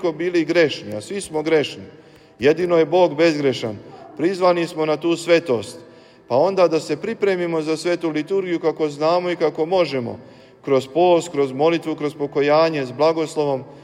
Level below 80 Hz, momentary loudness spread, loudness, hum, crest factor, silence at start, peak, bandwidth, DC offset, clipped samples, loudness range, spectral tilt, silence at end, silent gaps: -64 dBFS; 10 LU; -20 LUFS; none; 16 dB; 0 s; -4 dBFS; 12.5 kHz; under 0.1%; under 0.1%; 2 LU; -5.5 dB/octave; 0.05 s; none